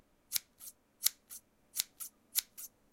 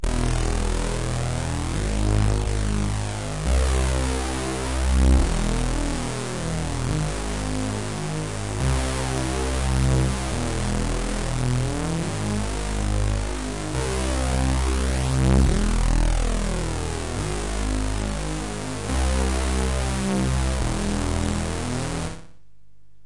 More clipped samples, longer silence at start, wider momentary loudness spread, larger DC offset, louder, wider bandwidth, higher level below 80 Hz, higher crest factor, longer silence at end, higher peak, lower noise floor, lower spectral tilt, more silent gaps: neither; first, 0.3 s vs 0.05 s; first, 17 LU vs 6 LU; second, under 0.1% vs 1%; second, -37 LUFS vs -25 LUFS; first, 17 kHz vs 11.5 kHz; second, -78 dBFS vs -26 dBFS; first, 36 dB vs 16 dB; second, 0.25 s vs 0.8 s; about the same, -6 dBFS vs -6 dBFS; about the same, -56 dBFS vs -59 dBFS; second, 3 dB/octave vs -5 dB/octave; neither